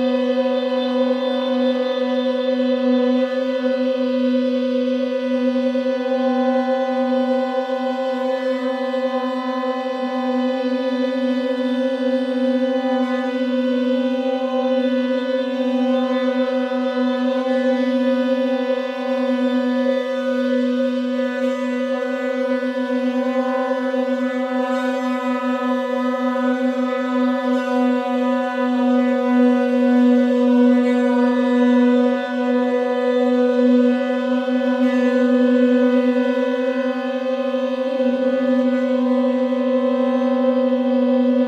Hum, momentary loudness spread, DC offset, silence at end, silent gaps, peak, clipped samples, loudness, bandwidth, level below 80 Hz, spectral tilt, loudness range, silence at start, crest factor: none; 6 LU; under 0.1%; 0 s; none; -6 dBFS; under 0.1%; -19 LUFS; 7.8 kHz; -74 dBFS; -5.5 dB/octave; 4 LU; 0 s; 14 dB